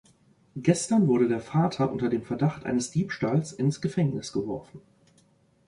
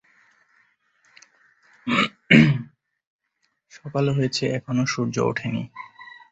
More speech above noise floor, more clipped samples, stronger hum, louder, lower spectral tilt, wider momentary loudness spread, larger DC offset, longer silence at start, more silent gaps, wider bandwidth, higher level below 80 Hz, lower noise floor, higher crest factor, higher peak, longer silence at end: second, 37 dB vs 49 dB; neither; neither; second, -27 LUFS vs -21 LUFS; about the same, -6.5 dB/octave vs -5.5 dB/octave; second, 9 LU vs 25 LU; neither; second, 0.55 s vs 1.85 s; second, none vs 3.07-3.19 s; first, 11.5 kHz vs 8.2 kHz; about the same, -60 dBFS vs -58 dBFS; second, -63 dBFS vs -73 dBFS; about the same, 18 dB vs 22 dB; second, -8 dBFS vs -2 dBFS; first, 0.9 s vs 0.25 s